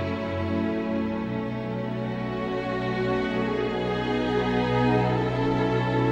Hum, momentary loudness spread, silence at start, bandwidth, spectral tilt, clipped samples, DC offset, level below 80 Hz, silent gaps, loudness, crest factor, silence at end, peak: none; 7 LU; 0 s; 8.2 kHz; -8 dB/octave; under 0.1%; under 0.1%; -46 dBFS; none; -26 LUFS; 14 dB; 0 s; -10 dBFS